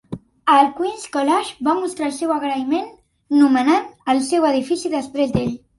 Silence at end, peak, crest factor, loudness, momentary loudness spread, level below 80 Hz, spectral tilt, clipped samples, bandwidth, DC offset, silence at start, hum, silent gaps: 0.2 s; -2 dBFS; 16 dB; -19 LUFS; 9 LU; -52 dBFS; -5 dB/octave; under 0.1%; 11.5 kHz; under 0.1%; 0.1 s; none; none